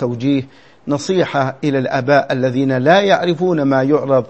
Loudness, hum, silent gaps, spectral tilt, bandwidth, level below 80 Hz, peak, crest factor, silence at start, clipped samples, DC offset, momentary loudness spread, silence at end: -15 LUFS; none; none; -6.5 dB/octave; 8.4 kHz; -60 dBFS; 0 dBFS; 16 dB; 0 s; under 0.1%; 0.3%; 7 LU; 0.05 s